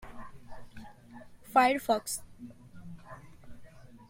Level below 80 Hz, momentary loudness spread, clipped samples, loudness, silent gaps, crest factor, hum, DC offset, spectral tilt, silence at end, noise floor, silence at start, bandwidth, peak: -58 dBFS; 27 LU; under 0.1%; -28 LUFS; none; 24 dB; none; under 0.1%; -3.5 dB/octave; 0.05 s; -51 dBFS; 0 s; 16.5 kHz; -10 dBFS